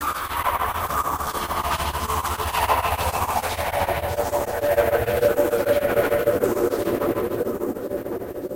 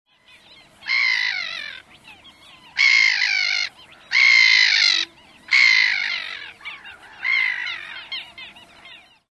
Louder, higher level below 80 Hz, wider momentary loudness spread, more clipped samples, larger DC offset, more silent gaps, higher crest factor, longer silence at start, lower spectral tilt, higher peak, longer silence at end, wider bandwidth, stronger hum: second, -23 LUFS vs -16 LUFS; first, -38 dBFS vs -68 dBFS; second, 6 LU vs 22 LU; neither; neither; neither; about the same, 16 dB vs 18 dB; second, 0 s vs 0.85 s; first, -4.5 dB/octave vs 2.5 dB/octave; about the same, -6 dBFS vs -4 dBFS; second, 0 s vs 0.4 s; first, 16 kHz vs 11 kHz; neither